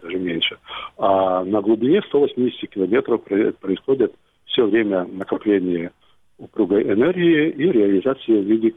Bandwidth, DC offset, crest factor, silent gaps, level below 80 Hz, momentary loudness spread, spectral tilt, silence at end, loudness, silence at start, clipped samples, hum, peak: 3.9 kHz; under 0.1%; 14 dB; none; -60 dBFS; 8 LU; -8.5 dB/octave; 0.05 s; -19 LUFS; 0 s; under 0.1%; none; -4 dBFS